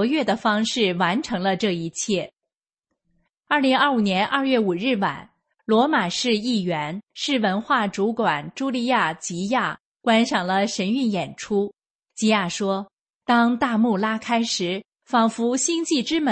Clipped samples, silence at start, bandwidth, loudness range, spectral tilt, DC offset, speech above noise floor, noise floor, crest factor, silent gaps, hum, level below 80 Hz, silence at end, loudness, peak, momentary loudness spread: under 0.1%; 0 s; 8.8 kHz; 2 LU; -4 dB/octave; under 0.1%; 64 dB; -86 dBFS; 18 dB; 9.80-9.92 s, 11.90-11.99 s, 12.93-13.06 s, 13.15-13.19 s, 14.88-14.92 s; none; -64 dBFS; 0 s; -22 LUFS; -6 dBFS; 8 LU